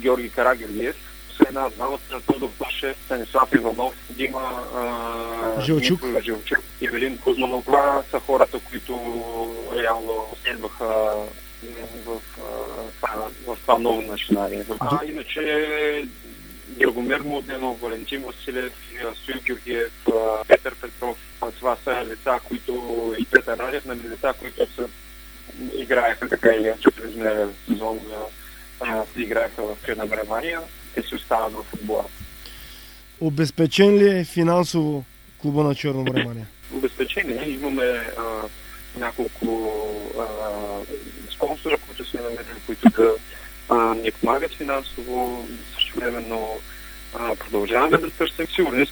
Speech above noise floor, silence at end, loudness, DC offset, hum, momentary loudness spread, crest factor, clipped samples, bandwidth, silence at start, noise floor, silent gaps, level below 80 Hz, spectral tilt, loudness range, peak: 20 dB; 0 s; -23 LUFS; under 0.1%; none; 15 LU; 24 dB; under 0.1%; over 20 kHz; 0 s; -43 dBFS; none; -44 dBFS; -5.5 dB/octave; 6 LU; 0 dBFS